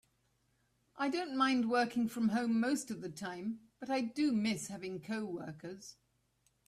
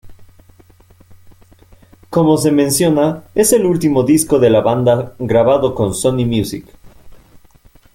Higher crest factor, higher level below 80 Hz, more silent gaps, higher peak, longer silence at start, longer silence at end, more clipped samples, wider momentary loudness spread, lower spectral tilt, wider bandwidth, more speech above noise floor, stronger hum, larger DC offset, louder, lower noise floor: about the same, 18 dB vs 14 dB; second, -76 dBFS vs -44 dBFS; neither; second, -18 dBFS vs 0 dBFS; first, 0.95 s vs 0.05 s; about the same, 0.75 s vs 0.75 s; neither; first, 14 LU vs 6 LU; about the same, -4.5 dB/octave vs -5.5 dB/octave; second, 14 kHz vs 17 kHz; first, 41 dB vs 34 dB; neither; neither; second, -36 LUFS vs -14 LUFS; first, -76 dBFS vs -47 dBFS